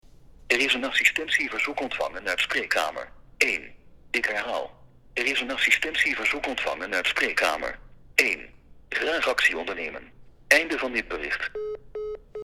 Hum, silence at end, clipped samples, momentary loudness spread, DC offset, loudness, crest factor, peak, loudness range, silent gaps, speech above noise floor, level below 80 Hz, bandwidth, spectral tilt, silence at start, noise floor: none; 0 s; under 0.1%; 14 LU; under 0.1%; -24 LUFS; 28 dB; 0 dBFS; 3 LU; none; 22 dB; -54 dBFS; 17.5 kHz; -1 dB/octave; 0.25 s; -48 dBFS